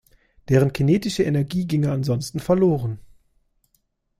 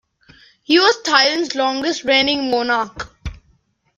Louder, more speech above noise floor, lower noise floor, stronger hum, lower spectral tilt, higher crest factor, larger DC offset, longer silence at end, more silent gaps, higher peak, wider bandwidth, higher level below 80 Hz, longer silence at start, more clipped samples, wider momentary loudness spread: second, -21 LUFS vs -16 LUFS; first, 49 dB vs 43 dB; first, -69 dBFS vs -60 dBFS; neither; first, -7 dB/octave vs -2.5 dB/octave; about the same, 18 dB vs 18 dB; neither; first, 1.2 s vs 0.6 s; neither; second, -4 dBFS vs 0 dBFS; first, 15 kHz vs 11 kHz; second, -50 dBFS vs -44 dBFS; second, 0.5 s vs 0.7 s; neither; second, 7 LU vs 17 LU